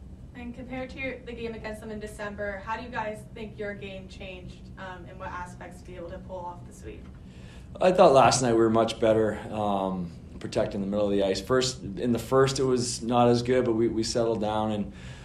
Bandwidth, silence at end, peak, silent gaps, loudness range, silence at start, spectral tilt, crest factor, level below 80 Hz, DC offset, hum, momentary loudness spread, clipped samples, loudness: 13.5 kHz; 0 s; -6 dBFS; none; 16 LU; 0 s; -5 dB/octave; 22 dB; -48 dBFS; under 0.1%; none; 20 LU; under 0.1%; -26 LUFS